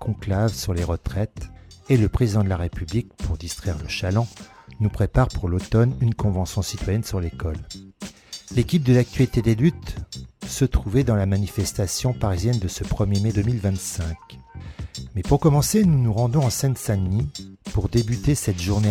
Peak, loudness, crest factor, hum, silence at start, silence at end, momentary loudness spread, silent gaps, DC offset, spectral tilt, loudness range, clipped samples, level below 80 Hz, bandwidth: -6 dBFS; -23 LUFS; 16 dB; none; 0 s; 0 s; 16 LU; none; under 0.1%; -6 dB/octave; 3 LU; under 0.1%; -34 dBFS; 16.5 kHz